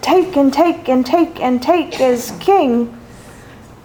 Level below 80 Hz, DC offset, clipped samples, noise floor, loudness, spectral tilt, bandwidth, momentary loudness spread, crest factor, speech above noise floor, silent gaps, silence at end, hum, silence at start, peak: -48 dBFS; under 0.1%; under 0.1%; -38 dBFS; -15 LUFS; -5 dB/octave; over 20 kHz; 5 LU; 14 dB; 24 dB; none; 0.1 s; none; 0 s; 0 dBFS